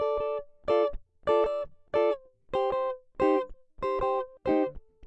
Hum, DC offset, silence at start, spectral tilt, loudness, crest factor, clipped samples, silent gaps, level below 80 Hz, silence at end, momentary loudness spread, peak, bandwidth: none; under 0.1%; 0 s; -7 dB/octave; -29 LUFS; 16 dB; under 0.1%; none; -50 dBFS; 0 s; 9 LU; -14 dBFS; 8 kHz